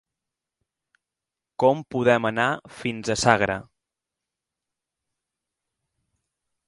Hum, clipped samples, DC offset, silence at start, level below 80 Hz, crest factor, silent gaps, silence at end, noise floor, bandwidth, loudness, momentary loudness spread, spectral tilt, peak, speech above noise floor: none; under 0.1%; under 0.1%; 1.6 s; -58 dBFS; 26 dB; none; 3.05 s; -88 dBFS; 11.5 kHz; -23 LUFS; 11 LU; -4.5 dB/octave; 0 dBFS; 65 dB